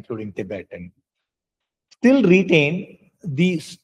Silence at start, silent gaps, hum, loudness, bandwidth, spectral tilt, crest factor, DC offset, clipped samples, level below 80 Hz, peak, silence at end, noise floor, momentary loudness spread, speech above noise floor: 0.1 s; none; none; -18 LUFS; 11.5 kHz; -7 dB/octave; 20 dB; under 0.1%; under 0.1%; -64 dBFS; -2 dBFS; 0.1 s; -85 dBFS; 20 LU; 65 dB